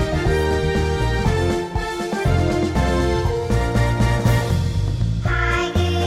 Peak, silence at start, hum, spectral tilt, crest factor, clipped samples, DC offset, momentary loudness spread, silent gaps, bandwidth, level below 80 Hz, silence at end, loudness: -6 dBFS; 0 s; none; -6.5 dB/octave; 14 dB; under 0.1%; under 0.1%; 4 LU; none; 15.5 kHz; -26 dBFS; 0 s; -20 LUFS